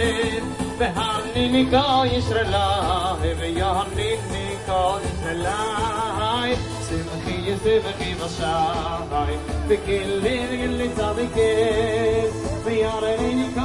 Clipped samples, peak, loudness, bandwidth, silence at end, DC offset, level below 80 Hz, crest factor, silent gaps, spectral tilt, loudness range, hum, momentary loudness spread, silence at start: under 0.1%; -4 dBFS; -23 LUFS; 11.5 kHz; 0 s; under 0.1%; -36 dBFS; 18 dB; none; -5 dB/octave; 3 LU; none; 7 LU; 0 s